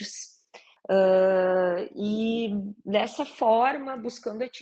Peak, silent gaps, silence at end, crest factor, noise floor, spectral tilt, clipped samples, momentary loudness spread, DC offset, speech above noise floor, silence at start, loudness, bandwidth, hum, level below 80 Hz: -10 dBFS; none; 0 s; 16 dB; -54 dBFS; -5.5 dB/octave; under 0.1%; 13 LU; under 0.1%; 30 dB; 0 s; -25 LUFS; 8.4 kHz; none; -70 dBFS